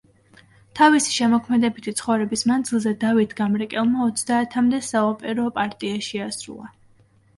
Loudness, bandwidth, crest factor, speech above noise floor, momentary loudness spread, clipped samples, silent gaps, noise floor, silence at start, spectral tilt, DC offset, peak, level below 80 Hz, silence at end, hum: -21 LUFS; 11.5 kHz; 18 dB; 36 dB; 10 LU; under 0.1%; none; -56 dBFS; 0.75 s; -4 dB/octave; under 0.1%; -4 dBFS; -62 dBFS; 0.7 s; none